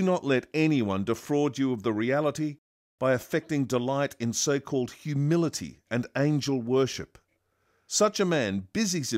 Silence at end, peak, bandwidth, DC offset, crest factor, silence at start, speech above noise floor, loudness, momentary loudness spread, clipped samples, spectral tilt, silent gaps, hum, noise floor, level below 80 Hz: 0 s; -10 dBFS; 16 kHz; under 0.1%; 18 dB; 0 s; 46 dB; -27 LUFS; 6 LU; under 0.1%; -5 dB/octave; 2.58-2.98 s; none; -72 dBFS; -66 dBFS